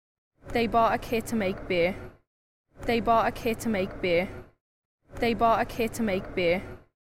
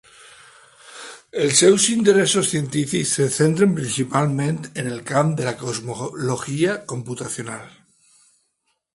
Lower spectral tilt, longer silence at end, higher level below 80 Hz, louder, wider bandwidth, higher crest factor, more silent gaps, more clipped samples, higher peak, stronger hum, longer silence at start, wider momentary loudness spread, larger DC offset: first, -5.5 dB/octave vs -4 dB/octave; second, 0.25 s vs 1.25 s; first, -46 dBFS vs -60 dBFS; second, -27 LUFS vs -20 LUFS; first, 16 kHz vs 11.5 kHz; about the same, 16 dB vs 20 dB; first, 2.27-2.64 s, 4.60-4.98 s vs none; neither; second, -12 dBFS vs -2 dBFS; neither; second, 0.45 s vs 0.85 s; second, 8 LU vs 15 LU; neither